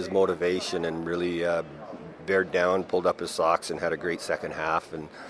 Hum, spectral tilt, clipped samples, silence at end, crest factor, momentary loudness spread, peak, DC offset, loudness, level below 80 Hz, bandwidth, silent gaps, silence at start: none; -4.5 dB/octave; under 0.1%; 0 s; 20 dB; 8 LU; -8 dBFS; under 0.1%; -27 LUFS; -60 dBFS; 11 kHz; none; 0 s